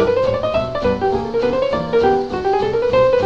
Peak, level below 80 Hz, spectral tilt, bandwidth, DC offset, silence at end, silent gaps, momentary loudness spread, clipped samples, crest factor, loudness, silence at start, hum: -4 dBFS; -38 dBFS; -7 dB/octave; 7.6 kHz; 0.1%; 0 s; none; 4 LU; under 0.1%; 12 dB; -17 LUFS; 0 s; none